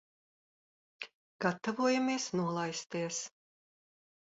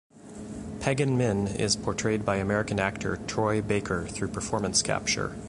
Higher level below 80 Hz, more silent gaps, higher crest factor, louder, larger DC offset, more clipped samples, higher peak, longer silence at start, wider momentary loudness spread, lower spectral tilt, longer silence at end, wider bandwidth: second, -80 dBFS vs -48 dBFS; first, 1.14-1.39 s vs none; about the same, 20 dB vs 18 dB; second, -34 LUFS vs -27 LUFS; neither; neither; second, -16 dBFS vs -10 dBFS; first, 1 s vs 0.15 s; first, 17 LU vs 8 LU; about the same, -4 dB/octave vs -4 dB/octave; first, 1.05 s vs 0 s; second, 7.6 kHz vs 11.5 kHz